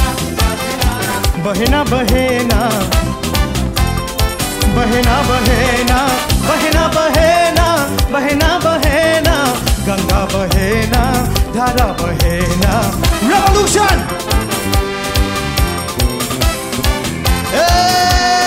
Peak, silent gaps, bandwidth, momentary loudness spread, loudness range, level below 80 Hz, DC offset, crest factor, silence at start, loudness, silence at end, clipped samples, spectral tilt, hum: 0 dBFS; none; 16.5 kHz; 6 LU; 3 LU; -20 dBFS; under 0.1%; 12 dB; 0 s; -13 LUFS; 0 s; under 0.1%; -4.5 dB/octave; none